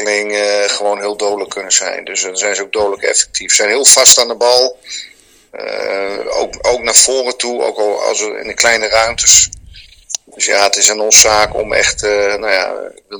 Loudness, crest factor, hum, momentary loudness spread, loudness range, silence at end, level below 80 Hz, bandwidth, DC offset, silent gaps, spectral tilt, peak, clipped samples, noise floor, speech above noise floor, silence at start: -11 LUFS; 14 dB; none; 14 LU; 5 LU; 0 s; -42 dBFS; over 20 kHz; under 0.1%; none; 0.5 dB/octave; 0 dBFS; 1%; -38 dBFS; 25 dB; 0 s